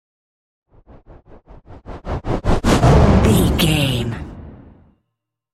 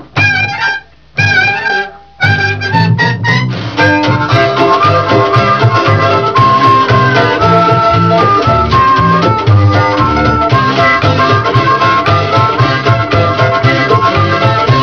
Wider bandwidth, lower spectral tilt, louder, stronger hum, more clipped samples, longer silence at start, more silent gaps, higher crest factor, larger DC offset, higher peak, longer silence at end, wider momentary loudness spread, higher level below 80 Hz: first, 16 kHz vs 5.4 kHz; about the same, -6 dB/octave vs -6.5 dB/octave; second, -16 LUFS vs -9 LUFS; neither; second, under 0.1% vs 0.5%; first, 1.7 s vs 0 s; neither; first, 18 dB vs 8 dB; second, under 0.1% vs 0.6%; about the same, 0 dBFS vs 0 dBFS; first, 1 s vs 0 s; first, 22 LU vs 4 LU; first, -26 dBFS vs -32 dBFS